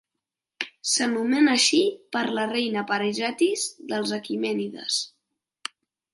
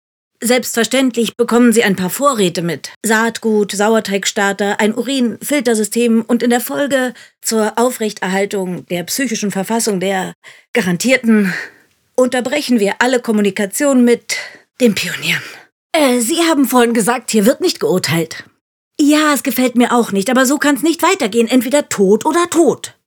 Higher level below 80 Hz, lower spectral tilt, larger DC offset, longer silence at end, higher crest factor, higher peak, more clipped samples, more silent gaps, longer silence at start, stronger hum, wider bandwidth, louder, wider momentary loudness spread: second, -78 dBFS vs -66 dBFS; second, -2.5 dB/octave vs -4 dB/octave; neither; first, 1.05 s vs 0.15 s; first, 20 dB vs 14 dB; second, -6 dBFS vs 0 dBFS; neither; second, none vs 2.96-3.01 s, 10.35-10.42 s, 10.68-10.74 s, 15.72-15.90 s, 18.61-18.91 s; first, 0.6 s vs 0.4 s; neither; second, 11.5 kHz vs over 20 kHz; second, -24 LUFS vs -14 LUFS; first, 15 LU vs 8 LU